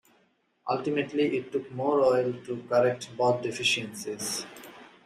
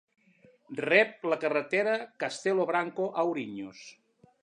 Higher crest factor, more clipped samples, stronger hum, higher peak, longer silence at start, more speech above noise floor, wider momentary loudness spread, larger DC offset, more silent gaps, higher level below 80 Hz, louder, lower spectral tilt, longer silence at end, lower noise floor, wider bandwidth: about the same, 18 dB vs 22 dB; neither; neither; second, -12 dBFS vs -8 dBFS; about the same, 0.65 s vs 0.7 s; first, 41 dB vs 33 dB; second, 12 LU vs 17 LU; neither; neither; first, -72 dBFS vs -82 dBFS; about the same, -28 LUFS vs -29 LUFS; about the same, -4 dB/octave vs -4.5 dB/octave; second, 0.15 s vs 0.5 s; first, -69 dBFS vs -62 dBFS; first, 15.5 kHz vs 10.5 kHz